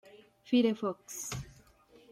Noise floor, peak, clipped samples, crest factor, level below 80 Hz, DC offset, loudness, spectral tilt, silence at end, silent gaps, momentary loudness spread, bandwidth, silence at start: -61 dBFS; -16 dBFS; under 0.1%; 18 dB; -62 dBFS; under 0.1%; -33 LUFS; -4.5 dB/octave; 0.6 s; none; 14 LU; 16 kHz; 0.15 s